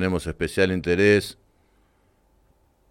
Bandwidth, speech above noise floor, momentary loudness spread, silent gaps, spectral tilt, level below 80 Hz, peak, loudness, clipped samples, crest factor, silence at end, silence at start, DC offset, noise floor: 16 kHz; 41 dB; 9 LU; none; -6 dB/octave; -46 dBFS; -6 dBFS; -22 LUFS; under 0.1%; 18 dB; 1.6 s; 0 s; under 0.1%; -63 dBFS